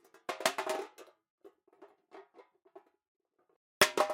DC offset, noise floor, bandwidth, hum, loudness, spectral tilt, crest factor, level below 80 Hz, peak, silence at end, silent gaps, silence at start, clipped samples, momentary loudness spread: under 0.1%; -63 dBFS; 16.5 kHz; none; -32 LUFS; -1 dB/octave; 30 dB; -76 dBFS; -8 dBFS; 0 s; 1.30-1.38 s, 3.08-3.20 s, 3.56-3.81 s; 0.3 s; under 0.1%; 28 LU